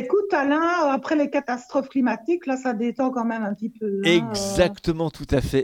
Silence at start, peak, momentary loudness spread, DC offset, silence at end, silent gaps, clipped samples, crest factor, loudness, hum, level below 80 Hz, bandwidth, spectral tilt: 0 s; -6 dBFS; 6 LU; under 0.1%; 0 s; none; under 0.1%; 16 dB; -23 LUFS; none; -42 dBFS; 16 kHz; -5.5 dB/octave